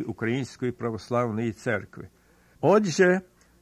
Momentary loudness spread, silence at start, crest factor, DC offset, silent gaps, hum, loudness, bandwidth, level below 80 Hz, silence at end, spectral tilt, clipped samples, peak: 11 LU; 0 s; 18 dB; under 0.1%; none; none; -26 LUFS; 13 kHz; -60 dBFS; 0.4 s; -6 dB/octave; under 0.1%; -8 dBFS